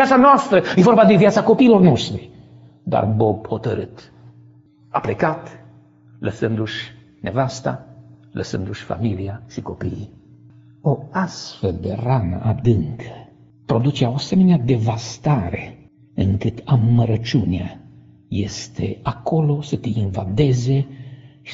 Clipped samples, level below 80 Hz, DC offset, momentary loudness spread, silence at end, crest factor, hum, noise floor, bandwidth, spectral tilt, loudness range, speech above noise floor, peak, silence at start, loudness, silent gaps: under 0.1%; -46 dBFS; under 0.1%; 19 LU; 0 s; 18 dB; none; -49 dBFS; 8 kHz; -6.5 dB/octave; 10 LU; 31 dB; 0 dBFS; 0 s; -19 LUFS; none